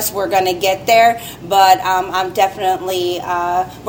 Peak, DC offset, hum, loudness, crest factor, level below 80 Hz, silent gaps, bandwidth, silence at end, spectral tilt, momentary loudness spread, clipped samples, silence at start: 0 dBFS; under 0.1%; none; -15 LUFS; 16 dB; -48 dBFS; none; 17 kHz; 0 s; -3 dB/octave; 8 LU; under 0.1%; 0 s